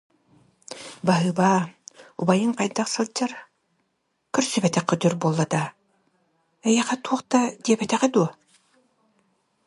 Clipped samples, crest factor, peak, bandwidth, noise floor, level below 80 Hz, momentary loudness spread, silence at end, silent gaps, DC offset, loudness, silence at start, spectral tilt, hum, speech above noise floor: under 0.1%; 20 dB; -4 dBFS; 11.5 kHz; -74 dBFS; -68 dBFS; 11 LU; 1.35 s; none; under 0.1%; -23 LUFS; 0.7 s; -5 dB/octave; none; 52 dB